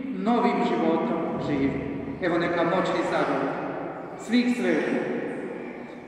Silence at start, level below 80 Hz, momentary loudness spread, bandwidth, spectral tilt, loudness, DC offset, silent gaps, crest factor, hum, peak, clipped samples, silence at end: 0 s; -56 dBFS; 11 LU; 11 kHz; -6.5 dB/octave; -26 LUFS; under 0.1%; none; 16 dB; none; -10 dBFS; under 0.1%; 0 s